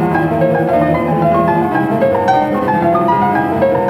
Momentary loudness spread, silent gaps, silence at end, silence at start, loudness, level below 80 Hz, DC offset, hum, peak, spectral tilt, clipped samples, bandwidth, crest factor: 2 LU; none; 0 s; 0 s; -13 LUFS; -42 dBFS; under 0.1%; none; -2 dBFS; -8.5 dB/octave; under 0.1%; 16 kHz; 12 dB